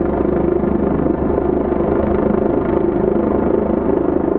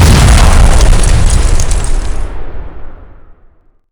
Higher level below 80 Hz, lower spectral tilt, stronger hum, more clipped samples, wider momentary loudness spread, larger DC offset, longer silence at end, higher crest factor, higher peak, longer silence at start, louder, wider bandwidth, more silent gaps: second, -30 dBFS vs -8 dBFS; first, -9.5 dB/octave vs -4.5 dB/octave; neither; second, under 0.1% vs 4%; second, 1 LU vs 21 LU; neither; second, 0 s vs 0.7 s; first, 14 dB vs 8 dB; about the same, -2 dBFS vs 0 dBFS; about the same, 0 s vs 0 s; second, -17 LUFS vs -10 LUFS; second, 3.9 kHz vs 18 kHz; neither